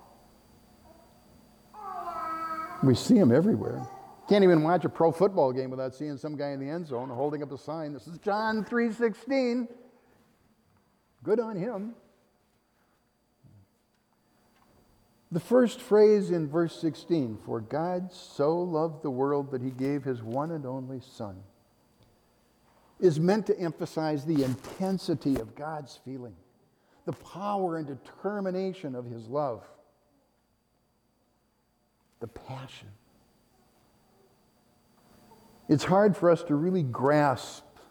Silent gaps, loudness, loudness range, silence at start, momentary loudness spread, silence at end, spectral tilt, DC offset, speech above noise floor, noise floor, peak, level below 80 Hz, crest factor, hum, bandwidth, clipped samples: none; -28 LUFS; 17 LU; 1.75 s; 19 LU; 0.3 s; -7 dB/octave; under 0.1%; 44 dB; -71 dBFS; -12 dBFS; -66 dBFS; 18 dB; none; 18.5 kHz; under 0.1%